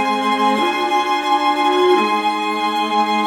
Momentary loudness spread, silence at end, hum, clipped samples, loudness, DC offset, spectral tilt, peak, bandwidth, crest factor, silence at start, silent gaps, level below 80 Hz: 4 LU; 0 s; none; under 0.1%; -16 LUFS; under 0.1%; -3.5 dB/octave; -4 dBFS; 17.5 kHz; 12 dB; 0 s; none; -60 dBFS